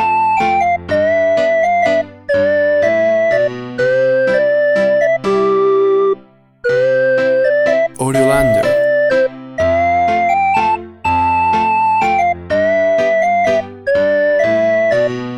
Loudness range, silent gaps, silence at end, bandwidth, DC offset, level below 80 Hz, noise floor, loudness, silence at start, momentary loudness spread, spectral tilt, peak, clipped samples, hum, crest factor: 1 LU; none; 0 s; 13 kHz; under 0.1%; -42 dBFS; -42 dBFS; -14 LUFS; 0 s; 4 LU; -5.5 dB/octave; 0 dBFS; under 0.1%; none; 12 dB